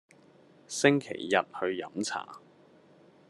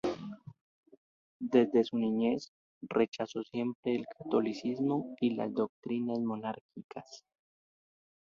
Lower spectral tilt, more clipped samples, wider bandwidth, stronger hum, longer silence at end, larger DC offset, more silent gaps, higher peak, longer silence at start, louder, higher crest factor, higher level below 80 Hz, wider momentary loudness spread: second, -4 dB/octave vs -7 dB/octave; neither; first, 12.5 kHz vs 7.2 kHz; neither; second, 0.9 s vs 1.2 s; neither; second, none vs 0.61-0.83 s, 0.97-1.40 s, 2.48-2.81 s, 3.08-3.12 s, 3.75-3.83 s, 5.69-5.82 s, 6.61-6.69 s, 6.84-6.89 s; first, -6 dBFS vs -12 dBFS; first, 0.7 s vs 0.05 s; first, -30 LUFS vs -33 LUFS; about the same, 26 dB vs 22 dB; second, -80 dBFS vs -74 dBFS; second, 13 LU vs 18 LU